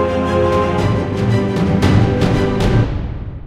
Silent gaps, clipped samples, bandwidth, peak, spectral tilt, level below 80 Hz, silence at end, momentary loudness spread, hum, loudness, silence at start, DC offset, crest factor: none; under 0.1%; 12 kHz; 0 dBFS; -7.5 dB/octave; -26 dBFS; 0 s; 4 LU; none; -15 LUFS; 0 s; under 0.1%; 14 dB